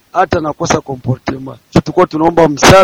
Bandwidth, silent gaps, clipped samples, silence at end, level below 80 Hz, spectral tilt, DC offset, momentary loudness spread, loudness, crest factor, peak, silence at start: 17.5 kHz; none; 1%; 0 s; -34 dBFS; -5 dB/octave; under 0.1%; 11 LU; -12 LUFS; 12 dB; 0 dBFS; 0.15 s